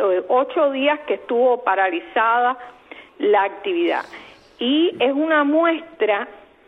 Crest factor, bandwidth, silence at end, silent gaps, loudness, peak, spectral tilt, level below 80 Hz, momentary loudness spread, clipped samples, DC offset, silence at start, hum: 14 dB; 6 kHz; 0.3 s; none; -19 LUFS; -6 dBFS; -5.5 dB/octave; -68 dBFS; 9 LU; under 0.1%; under 0.1%; 0 s; none